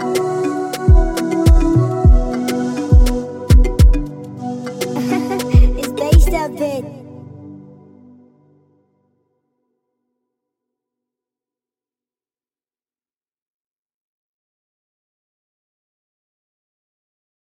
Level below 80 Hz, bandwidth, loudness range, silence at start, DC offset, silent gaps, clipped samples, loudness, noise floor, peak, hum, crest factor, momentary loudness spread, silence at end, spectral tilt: -20 dBFS; 16 kHz; 7 LU; 0 s; under 0.1%; none; under 0.1%; -16 LUFS; under -90 dBFS; 0 dBFS; none; 16 dB; 14 LU; 10 s; -7 dB/octave